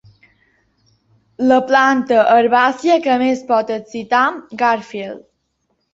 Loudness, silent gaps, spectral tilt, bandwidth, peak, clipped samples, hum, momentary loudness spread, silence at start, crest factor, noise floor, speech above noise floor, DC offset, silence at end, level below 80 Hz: -15 LUFS; none; -4.5 dB/octave; 7.8 kHz; -2 dBFS; under 0.1%; none; 13 LU; 1.4 s; 16 dB; -68 dBFS; 53 dB; under 0.1%; 0.75 s; -62 dBFS